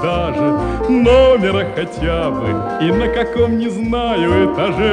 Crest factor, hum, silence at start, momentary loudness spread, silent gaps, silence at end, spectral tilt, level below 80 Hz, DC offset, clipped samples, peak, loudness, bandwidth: 14 dB; none; 0 s; 8 LU; none; 0 s; -7 dB/octave; -28 dBFS; under 0.1%; under 0.1%; 0 dBFS; -15 LUFS; 9.8 kHz